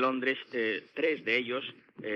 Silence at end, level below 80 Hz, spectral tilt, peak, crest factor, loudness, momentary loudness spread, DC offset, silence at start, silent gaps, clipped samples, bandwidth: 0 s; -88 dBFS; -5.5 dB/octave; -14 dBFS; 18 dB; -31 LUFS; 10 LU; under 0.1%; 0 s; none; under 0.1%; 7 kHz